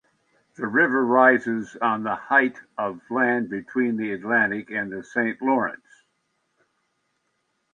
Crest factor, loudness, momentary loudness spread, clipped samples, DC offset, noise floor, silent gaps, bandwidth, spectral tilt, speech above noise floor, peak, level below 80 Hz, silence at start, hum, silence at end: 20 dB; -23 LUFS; 12 LU; under 0.1%; under 0.1%; -73 dBFS; none; 7.4 kHz; -7 dB/octave; 51 dB; -4 dBFS; -72 dBFS; 0.6 s; none; 2 s